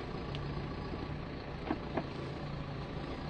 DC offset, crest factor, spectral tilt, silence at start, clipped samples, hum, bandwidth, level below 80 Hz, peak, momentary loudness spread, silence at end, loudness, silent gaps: under 0.1%; 20 dB; -7.5 dB/octave; 0 s; under 0.1%; none; 8.8 kHz; -48 dBFS; -20 dBFS; 4 LU; 0 s; -41 LUFS; none